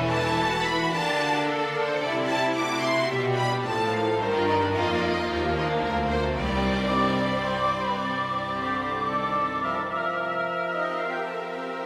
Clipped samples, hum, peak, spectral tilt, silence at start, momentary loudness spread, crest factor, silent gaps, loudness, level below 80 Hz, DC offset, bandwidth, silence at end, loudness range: under 0.1%; none; -12 dBFS; -5.5 dB/octave; 0 s; 4 LU; 14 dB; none; -25 LUFS; -44 dBFS; under 0.1%; 15.5 kHz; 0 s; 2 LU